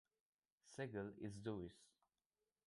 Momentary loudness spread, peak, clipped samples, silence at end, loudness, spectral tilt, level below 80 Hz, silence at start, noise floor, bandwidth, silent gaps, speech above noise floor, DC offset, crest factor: 8 LU; -34 dBFS; under 0.1%; 0.8 s; -52 LUFS; -6.5 dB/octave; -76 dBFS; 0.65 s; under -90 dBFS; 11.5 kHz; none; over 40 dB; under 0.1%; 20 dB